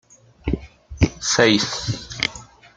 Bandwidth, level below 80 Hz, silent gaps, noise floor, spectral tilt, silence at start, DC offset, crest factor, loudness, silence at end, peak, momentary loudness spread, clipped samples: 9.6 kHz; -36 dBFS; none; -41 dBFS; -3.5 dB/octave; 0.45 s; under 0.1%; 22 dB; -21 LUFS; 0.35 s; 0 dBFS; 14 LU; under 0.1%